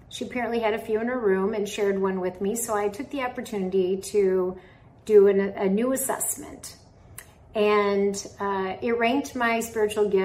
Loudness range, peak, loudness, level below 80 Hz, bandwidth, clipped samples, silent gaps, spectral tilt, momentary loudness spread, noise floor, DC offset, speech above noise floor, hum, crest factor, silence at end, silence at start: 3 LU; -6 dBFS; -25 LUFS; -58 dBFS; 16 kHz; under 0.1%; none; -4.5 dB/octave; 12 LU; -47 dBFS; under 0.1%; 23 dB; none; 18 dB; 0 s; 0.1 s